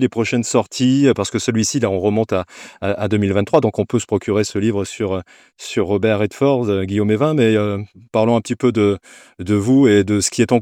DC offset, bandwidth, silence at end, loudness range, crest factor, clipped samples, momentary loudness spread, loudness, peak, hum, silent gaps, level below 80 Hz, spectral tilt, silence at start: under 0.1%; 15 kHz; 0 s; 3 LU; 16 dB; under 0.1%; 9 LU; -17 LUFS; 0 dBFS; none; none; -56 dBFS; -5.5 dB/octave; 0 s